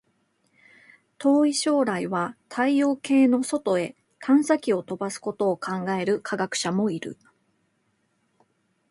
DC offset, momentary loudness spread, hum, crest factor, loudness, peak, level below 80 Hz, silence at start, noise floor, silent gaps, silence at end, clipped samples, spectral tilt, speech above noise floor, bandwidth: under 0.1%; 10 LU; none; 18 dB; -24 LUFS; -8 dBFS; -72 dBFS; 1.2 s; -71 dBFS; none; 1.75 s; under 0.1%; -5 dB/octave; 47 dB; 11.5 kHz